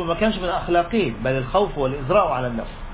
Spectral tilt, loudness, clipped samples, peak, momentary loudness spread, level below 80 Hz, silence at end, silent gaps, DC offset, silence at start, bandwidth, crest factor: -10.5 dB/octave; -22 LUFS; under 0.1%; -4 dBFS; 6 LU; -36 dBFS; 0 s; none; under 0.1%; 0 s; 4 kHz; 16 dB